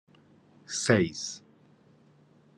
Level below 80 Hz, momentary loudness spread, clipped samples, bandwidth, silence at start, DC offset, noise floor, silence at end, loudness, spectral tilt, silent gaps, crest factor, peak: -68 dBFS; 14 LU; under 0.1%; 12.5 kHz; 0.7 s; under 0.1%; -60 dBFS; 1.2 s; -28 LUFS; -4.5 dB/octave; none; 24 dB; -8 dBFS